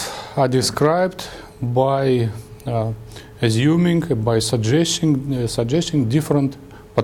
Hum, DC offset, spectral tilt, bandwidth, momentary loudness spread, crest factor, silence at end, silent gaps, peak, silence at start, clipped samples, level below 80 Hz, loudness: none; under 0.1%; -5.5 dB/octave; 17.5 kHz; 11 LU; 16 dB; 0 s; none; -2 dBFS; 0 s; under 0.1%; -46 dBFS; -19 LUFS